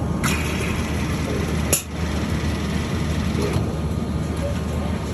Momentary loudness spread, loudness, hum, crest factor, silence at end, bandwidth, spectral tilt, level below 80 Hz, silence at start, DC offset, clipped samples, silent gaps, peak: 4 LU; -23 LUFS; none; 20 dB; 0 s; 15.5 kHz; -5 dB/octave; -30 dBFS; 0 s; under 0.1%; under 0.1%; none; -4 dBFS